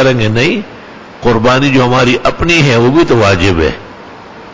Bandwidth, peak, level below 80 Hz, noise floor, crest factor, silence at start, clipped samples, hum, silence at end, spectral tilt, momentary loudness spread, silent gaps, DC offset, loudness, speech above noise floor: 7.8 kHz; 0 dBFS; -28 dBFS; -31 dBFS; 10 dB; 0 s; under 0.1%; none; 0 s; -5.5 dB/octave; 13 LU; none; under 0.1%; -9 LUFS; 22 dB